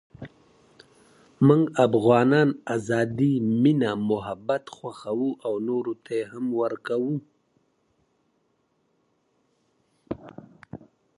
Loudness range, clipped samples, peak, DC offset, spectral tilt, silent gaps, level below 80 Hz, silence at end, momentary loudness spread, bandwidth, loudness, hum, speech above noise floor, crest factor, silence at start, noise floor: 14 LU; under 0.1%; -4 dBFS; under 0.1%; -7.5 dB/octave; none; -64 dBFS; 0.4 s; 19 LU; 11.5 kHz; -24 LUFS; none; 47 dB; 20 dB; 0.2 s; -70 dBFS